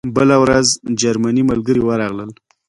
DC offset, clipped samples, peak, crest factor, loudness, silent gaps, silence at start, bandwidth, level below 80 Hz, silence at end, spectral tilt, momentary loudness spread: under 0.1%; under 0.1%; 0 dBFS; 14 dB; -15 LUFS; none; 0.05 s; 11.5 kHz; -44 dBFS; 0.35 s; -4.5 dB/octave; 11 LU